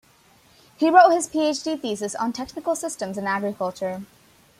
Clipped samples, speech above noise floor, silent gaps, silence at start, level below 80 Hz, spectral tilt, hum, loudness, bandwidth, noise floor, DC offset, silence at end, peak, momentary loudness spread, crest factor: under 0.1%; 34 dB; none; 0.8 s; -64 dBFS; -4 dB/octave; none; -22 LUFS; 15.5 kHz; -56 dBFS; under 0.1%; 0.55 s; -2 dBFS; 14 LU; 22 dB